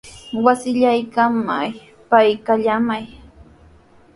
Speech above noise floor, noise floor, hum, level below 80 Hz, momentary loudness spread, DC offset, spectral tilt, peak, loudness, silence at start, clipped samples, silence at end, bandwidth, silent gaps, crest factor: 32 dB; -49 dBFS; none; -52 dBFS; 13 LU; under 0.1%; -5.5 dB/octave; 0 dBFS; -18 LUFS; 0.05 s; under 0.1%; 1 s; 11.5 kHz; none; 18 dB